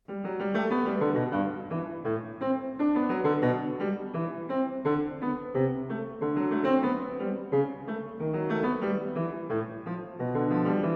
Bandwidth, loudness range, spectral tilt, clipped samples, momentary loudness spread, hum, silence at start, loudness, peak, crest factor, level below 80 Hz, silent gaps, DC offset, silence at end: 5.4 kHz; 2 LU; -10 dB/octave; under 0.1%; 7 LU; none; 0.1 s; -29 LUFS; -12 dBFS; 16 dB; -64 dBFS; none; under 0.1%; 0 s